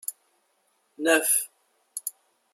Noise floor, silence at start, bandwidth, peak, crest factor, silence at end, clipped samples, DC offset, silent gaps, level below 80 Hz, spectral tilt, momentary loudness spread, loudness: -70 dBFS; 0.1 s; 16 kHz; -8 dBFS; 22 dB; 0.45 s; under 0.1%; under 0.1%; none; -90 dBFS; 0 dB/octave; 18 LU; -25 LUFS